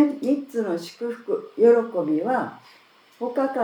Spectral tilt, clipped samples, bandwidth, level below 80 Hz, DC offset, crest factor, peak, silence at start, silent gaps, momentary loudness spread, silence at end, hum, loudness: -6.5 dB/octave; under 0.1%; 17 kHz; -90 dBFS; under 0.1%; 18 dB; -6 dBFS; 0 s; none; 14 LU; 0 s; none; -23 LUFS